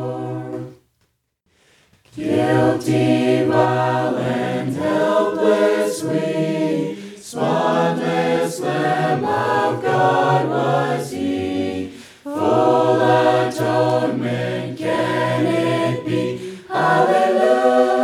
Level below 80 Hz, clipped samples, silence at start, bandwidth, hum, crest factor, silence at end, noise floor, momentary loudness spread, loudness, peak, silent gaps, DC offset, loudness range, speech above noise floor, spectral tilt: -62 dBFS; under 0.1%; 0 s; 15 kHz; none; 16 dB; 0 s; -67 dBFS; 10 LU; -18 LUFS; -2 dBFS; none; under 0.1%; 2 LU; 51 dB; -6 dB/octave